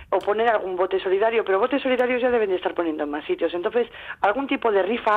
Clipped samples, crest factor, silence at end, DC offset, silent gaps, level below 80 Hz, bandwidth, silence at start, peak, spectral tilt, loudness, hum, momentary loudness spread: under 0.1%; 14 dB; 0 s; under 0.1%; none; -58 dBFS; 5 kHz; 0 s; -8 dBFS; -6 dB/octave; -23 LUFS; none; 5 LU